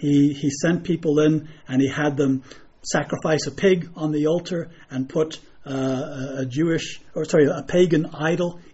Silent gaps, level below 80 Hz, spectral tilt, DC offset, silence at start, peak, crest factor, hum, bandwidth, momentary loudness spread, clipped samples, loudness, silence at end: none; -54 dBFS; -6 dB/octave; under 0.1%; 0 s; -6 dBFS; 16 dB; none; 8 kHz; 11 LU; under 0.1%; -22 LUFS; 0.05 s